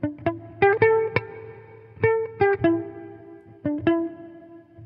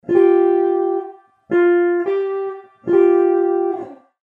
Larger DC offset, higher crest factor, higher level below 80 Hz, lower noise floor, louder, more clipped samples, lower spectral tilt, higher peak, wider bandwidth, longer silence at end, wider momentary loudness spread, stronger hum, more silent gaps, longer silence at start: neither; first, 22 dB vs 14 dB; first, -58 dBFS vs -76 dBFS; first, -46 dBFS vs -37 dBFS; second, -23 LUFS vs -17 LUFS; neither; first, -10 dB/octave vs -8.5 dB/octave; about the same, -4 dBFS vs -4 dBFS; first, 5.4 kHz vs 3.7 kHz; second, 0 s vs 0.3 s; first, 22 LU vs 15 LU; neither; neither; about the same, 0 s vs 0.1 s